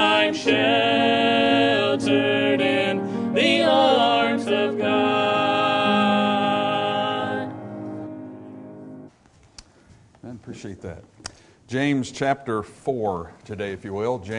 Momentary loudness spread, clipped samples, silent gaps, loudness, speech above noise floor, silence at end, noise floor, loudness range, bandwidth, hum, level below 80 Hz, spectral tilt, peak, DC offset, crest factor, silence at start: 20 LU; under 0.1%; none; -21 LUFS; 30 dB; 0 s; -54 dBFS; 19 LU; 11 kHz; none; -62 dBFS; -5 dB/octave; -4 dBFS; under 0.1%; 18 dB; 0 s